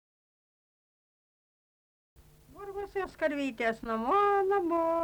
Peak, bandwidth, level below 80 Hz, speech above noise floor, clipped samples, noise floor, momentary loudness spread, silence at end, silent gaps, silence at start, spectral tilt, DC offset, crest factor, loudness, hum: -18 dBFS; over 20 kHz; -62 dBFS; 21 dB; under 0.1%; -50 dBFS; 14 LU; 0 s; none; 2.5 s; -5.5 dB/octave; under 0.1%; 16 dB; -30 LUFS; none